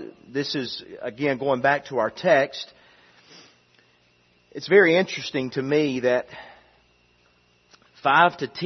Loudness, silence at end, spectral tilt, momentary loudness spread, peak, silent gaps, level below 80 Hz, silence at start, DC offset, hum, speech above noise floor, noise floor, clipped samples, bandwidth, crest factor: -22 LUFS; 0 s; -5.5 dB/octave; 18 LU; -2 dBFS; none; -68 dBFS; 0 s; under 0.1%; 60 Hz at -60 dBFS; 39 dB; -62 dBFS; under 0.1%; 6.4 kHz; 22 dB